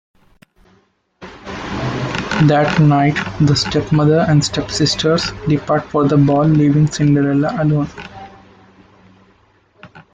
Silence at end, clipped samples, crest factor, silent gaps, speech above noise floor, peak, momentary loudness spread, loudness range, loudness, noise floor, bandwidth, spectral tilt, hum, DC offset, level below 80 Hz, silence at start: 0.1 s; under 0.1%; 14 dB; none; 43 dB; -2 dBFS; 11 LU; 3 LU; -15 LUFS; -57 dBFS; 9 kHz; -6 dB/octave; none; under 0.1%; -42 dBFS; 1.2 s